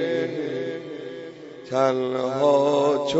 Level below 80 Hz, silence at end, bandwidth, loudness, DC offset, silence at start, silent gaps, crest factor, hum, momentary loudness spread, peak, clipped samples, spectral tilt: -70 dBFS; 0 s; 8 kHz; -23 LUFS; under 0.1%; 0 s; none; 16 dB; none; 18 LU; -8 dBFS; under 0.1%; -5.5 dB/octave